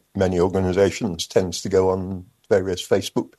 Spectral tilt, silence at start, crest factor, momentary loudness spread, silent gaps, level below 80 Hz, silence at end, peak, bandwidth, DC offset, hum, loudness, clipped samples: -5.5 dB/octave; 0.15 s; 18 dB; 6 LU; none; -50 dBFS; 0.1 s; -4 dBFS; 12.5 kHz; under 0.1%; none; -21 LUFS; under 0.1%